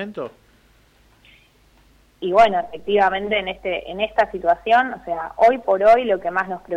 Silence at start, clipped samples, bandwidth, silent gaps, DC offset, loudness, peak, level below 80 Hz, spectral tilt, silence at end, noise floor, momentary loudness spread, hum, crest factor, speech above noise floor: 0 s; under 0.1%; 8 kHz; none; under 0.1%; -19 LUFS; -6 dBFS; -50 dBFS; -5.5 dB/octave; 0 s; -55 dBFS; 12 LU; none; 14 dB; 36 dB